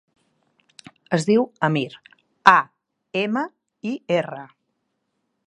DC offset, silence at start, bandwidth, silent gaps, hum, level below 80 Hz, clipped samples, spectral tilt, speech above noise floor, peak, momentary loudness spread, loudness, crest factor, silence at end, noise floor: under 0.1%; 1.1 s; 11 kHz; none; none; -70 dBFS; under 0.1%; -5.5 dB/octave; 54 dB; 0 dBFS; 17 LU; -21 LUFS; 24 dB; 1 s; -74 dBFS